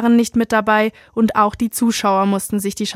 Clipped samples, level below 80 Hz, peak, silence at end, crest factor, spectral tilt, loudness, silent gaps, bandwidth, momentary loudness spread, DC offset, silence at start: under 0.1%; -50 dBFS; -2 dBFS; 0 s; 14 dB; -4.5 dB/octave; -17 LUFS; none; 16 kHz; 5 LU; under 0.1%; 0 s